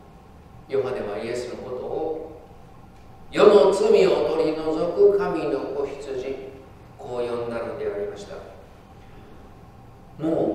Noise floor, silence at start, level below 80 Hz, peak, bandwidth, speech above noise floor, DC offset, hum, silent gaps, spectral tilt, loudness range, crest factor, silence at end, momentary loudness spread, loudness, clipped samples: -47 dBFS; 0.35 s; -52 dBFS; 0 dBFS; 10.5 kHz; 25 dB; under 0.1%; none; none; -6 dB/octave; 13 LU; 24 dB; 0 s; 18 LU; -23 LUFS; under 0.1%